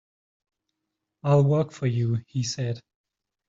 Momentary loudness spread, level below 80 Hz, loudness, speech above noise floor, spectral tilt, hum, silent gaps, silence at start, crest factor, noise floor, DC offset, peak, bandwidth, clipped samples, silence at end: 12 LU; -64 dBFS; -25 LUFS; 59 dB; -7 dB/octave; none; none; 1.25 s; 18 dB; -83 dBFS; under 0.1%; -8 dBFS; 7.6 kHz; under 0.1%; 0.7 s